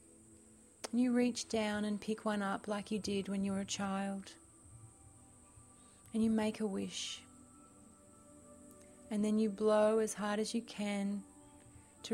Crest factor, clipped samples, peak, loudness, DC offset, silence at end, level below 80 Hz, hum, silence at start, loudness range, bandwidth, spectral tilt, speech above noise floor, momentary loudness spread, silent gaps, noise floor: 18 dB; under 0.1%; -20 dBFS; -36 LUFS; under 0.1%; 0 s; -70 dBFS; none; 0.3 s; 5 LU; 14.5 kHz; -5 dB/octave; 26 dB; 25 LU; none; -62 dBFS